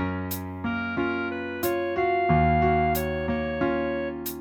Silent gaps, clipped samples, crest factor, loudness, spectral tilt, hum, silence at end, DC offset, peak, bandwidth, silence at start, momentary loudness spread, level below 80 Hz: none; under 0.1%; 16 dB; -26 LUFS; -6.5 dB/octave; none; 0 s; under 0.1%; -10 dBFS; 19 kHz; 0 s; 9 LU; -40 dBFS